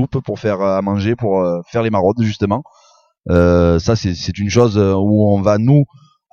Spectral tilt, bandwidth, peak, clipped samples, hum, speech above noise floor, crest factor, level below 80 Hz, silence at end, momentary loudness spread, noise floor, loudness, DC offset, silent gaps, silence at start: -7.5 dB/octave; 7.2 kHz; 0 dBFS; under 0.1%; none; 38 dB; 14 dB; -36 dBFS; 0.5 s; 8 LU; -52 dBFS; -15 LUFS; under 0.1%; none; 0 s